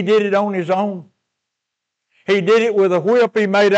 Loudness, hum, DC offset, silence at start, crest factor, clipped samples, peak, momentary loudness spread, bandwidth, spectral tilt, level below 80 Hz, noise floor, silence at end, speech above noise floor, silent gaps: -16 LUFS; none; under 0.1%; 0 s; 10 dB; under 0.1%; -6 dBFS; 9 LU; 8.4 kHz; -6 dB/octave; -76 dBFS; -80 dBFS; 0 s; 65 dB; none